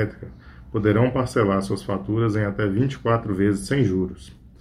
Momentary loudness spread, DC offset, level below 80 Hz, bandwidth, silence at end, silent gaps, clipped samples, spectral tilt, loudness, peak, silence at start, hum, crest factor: 10 LU; under 0.1%; -44 dBFS; 13 kHz; 0.1 s; none; under 0.1%; -7.5 dB/octave; -23 LUFS; -4 dBFS; 0 s; none; 18 dB